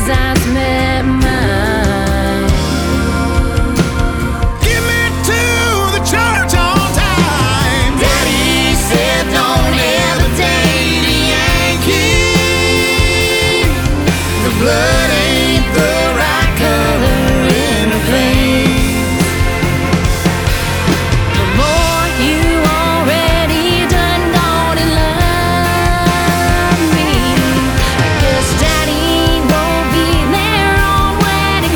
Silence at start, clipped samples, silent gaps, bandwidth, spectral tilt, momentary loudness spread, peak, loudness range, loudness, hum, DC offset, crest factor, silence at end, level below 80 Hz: 0 s; under 0.1%; none; over 20 kHz; -4.5 dB/octave; 3 LU; 0 dBFS; 2 LU; -12 LUFS; none; under 0.1%; 12 dB; 0 s; -20 dBFS